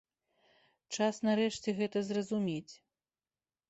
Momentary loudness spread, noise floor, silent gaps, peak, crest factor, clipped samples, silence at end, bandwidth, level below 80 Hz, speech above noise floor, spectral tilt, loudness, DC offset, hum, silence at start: 12 LU; under -90 dBFS; none; -18 dBFS; 18 dB; under 0.1%; 0.95 s; 8.2 kHz; -76 dBFS; over 57 dB; -5 dB/octave; -34 LUFS; under 0.1%; none; 0.9 s